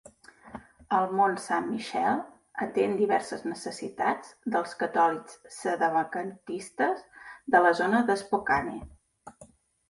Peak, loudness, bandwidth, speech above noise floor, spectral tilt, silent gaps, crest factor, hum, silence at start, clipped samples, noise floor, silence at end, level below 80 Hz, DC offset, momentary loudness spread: -8 dBFS; -28 LUFS; 11.5 kHz; 29 dB; -5 dB/octave; none; 20 dB; none; 0.45 s; under 0.1%; -56 dBFS; 0.45 s; -62 dBFS; under 0.1%; 15 LU